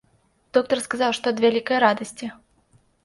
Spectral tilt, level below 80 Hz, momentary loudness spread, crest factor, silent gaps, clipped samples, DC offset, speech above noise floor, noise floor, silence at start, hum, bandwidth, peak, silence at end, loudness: -3.5 dB/octave; -66 dBFS; 14 LU; 20 dB; none; under 0.1%; under 0.1%; 42 dB; -63 dBFS; 0.55 s; none; 11.5 kHz; -4 dBFS; 0.7 s; -22 LUFS